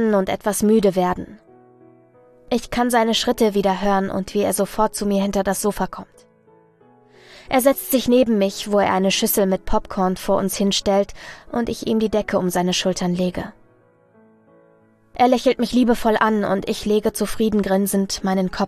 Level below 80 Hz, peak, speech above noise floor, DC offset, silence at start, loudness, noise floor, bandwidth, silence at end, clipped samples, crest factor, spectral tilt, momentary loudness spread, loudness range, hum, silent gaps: -42 dBFS; -2 dBFS; 36 dB; under 0.1%; 0 s; -20 LUFS; -55 dBFS; 14 kHz; 0 s; under 0.1%; 18 dB; -4.5 dB/octave; 8 LU; 4 LU; none; none